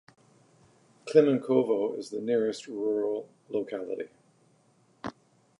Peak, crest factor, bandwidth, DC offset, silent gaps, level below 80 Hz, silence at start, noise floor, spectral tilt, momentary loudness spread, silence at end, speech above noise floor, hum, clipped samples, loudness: -8 dBFS; 22 dB; 11 kHz; under 0.1%; none; -76 dBFS; 1.05 s; -65 dBFS; -6.5 dB/octave; 19 LU; 0.5 s; 37 dB; none; under 0.1%; -28 LUFS